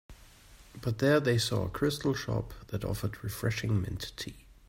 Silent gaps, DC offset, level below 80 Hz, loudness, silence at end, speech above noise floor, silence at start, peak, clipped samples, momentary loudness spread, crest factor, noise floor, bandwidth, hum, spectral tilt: none; under 0.1%; -50 dBFS; -32 LUFS; 0.15 s; 24 dB; 0.1 s; -14 dBFS; under 0.1%; 13 LU; 18 dB; -55 dBFS; 16 kHz; none; -5.5 dB/octave